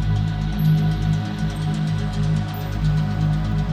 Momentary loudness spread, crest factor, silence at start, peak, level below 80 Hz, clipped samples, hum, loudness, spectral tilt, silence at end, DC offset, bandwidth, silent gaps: 5 LU; 12 dB; 0 s; -8 dBFS; -30 dBFS; under 0.1%; 50 Hz at -40 dBFS; -22 LUFS; -7.5 dB/octave; 0 s; under 0.1%; 15 kHz; none